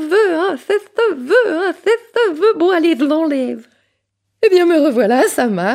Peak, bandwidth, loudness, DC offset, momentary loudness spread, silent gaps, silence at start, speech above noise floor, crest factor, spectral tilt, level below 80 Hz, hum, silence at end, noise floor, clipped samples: -2 dBFS; 16 kHz; -15 LUFS; under 0.1%; 6 LU; none; 0 s; 56 dB; 14 dB; -4.5 dB/octave; -70 dBFS; none; 0 s; -70 dBFS; under 0.1%